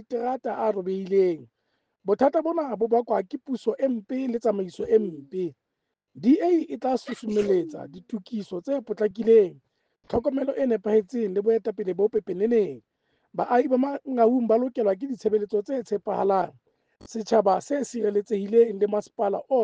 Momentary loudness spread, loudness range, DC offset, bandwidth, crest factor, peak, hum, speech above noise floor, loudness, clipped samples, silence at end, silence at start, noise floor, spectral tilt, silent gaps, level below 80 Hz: 11 LU; 2 LU; under 0.1%; 8.4 kHz; 18 dB; -8 dBFS; none; 57 dB; -25 LUFS; under 0.1%; 0 s; 0.1 s; -82 dBFS; -7 dB/octave; none; -64 dBFS